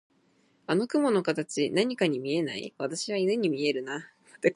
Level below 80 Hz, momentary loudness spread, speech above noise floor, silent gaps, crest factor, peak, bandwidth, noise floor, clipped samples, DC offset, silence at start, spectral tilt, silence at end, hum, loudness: -78 dBFS; 9 LU; 39 dB; none; 18 dB; -10 dBFS; 11.5 kHz; -67 dBFS; under 0.1%; under 0.1%; 0.7 s; -5 dB/octave; 0 s; none; -28 LUFS